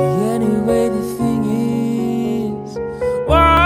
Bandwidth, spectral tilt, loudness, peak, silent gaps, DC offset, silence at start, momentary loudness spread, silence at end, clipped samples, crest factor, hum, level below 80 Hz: over 20 kHz; -6.5 dB/octave; -18 LUFS; 0 dBFS; none; under 0.1%; 0 s; 8 LU; 0 s; under 0.1%; 16 dB; none; -30 dBFS